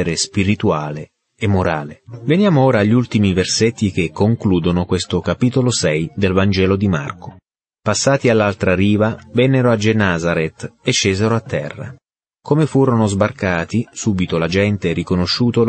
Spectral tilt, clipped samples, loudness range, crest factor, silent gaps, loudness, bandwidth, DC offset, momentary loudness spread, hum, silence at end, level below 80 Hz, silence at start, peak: -5.5 dB/octave; under 0.1%; 2 LU; 14 dB; none; -16 LUFS; 8.8 kHz; under 0.1%; 10 LU; none; 0 s; -46 dBFS; 0 s; -2 dBFS